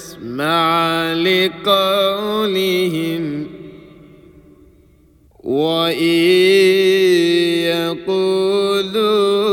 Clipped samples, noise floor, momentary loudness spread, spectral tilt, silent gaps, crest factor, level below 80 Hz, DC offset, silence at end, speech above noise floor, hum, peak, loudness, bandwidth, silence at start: under 0.1%; -50 dBFS; 10 LU; -5 dB/octave; none; 16 dB; -56 dBFS; under 0.1%; 0 s; 35 dB; none; -2 dBFS; -15 LUFS; 18 kHz; 0 s